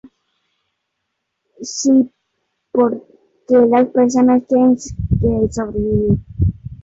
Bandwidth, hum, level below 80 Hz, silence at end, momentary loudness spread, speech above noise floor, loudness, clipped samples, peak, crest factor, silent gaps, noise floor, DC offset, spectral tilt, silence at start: 7.8 kHz; none; -32 dBFS; 0.1 s; 9 LU; 60 dB; -16 LUFS; under 0.1%; -4 dBFS; 14 dB; none; -74 dBFS; under 0.1%; -7 dB/octave; 1.6 s